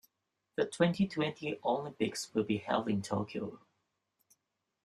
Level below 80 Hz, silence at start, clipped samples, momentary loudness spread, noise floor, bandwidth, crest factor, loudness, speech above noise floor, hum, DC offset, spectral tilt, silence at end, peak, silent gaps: -72 dBFS; 0.6 s; under 0.1%; 9 LU; -85 dBFS; 13.5 kHz; 22 dB; -34 LUFS; 51 dB; none; under 0.1%; -5.5 dB/octave; 1.25 s; -14 dBFS; none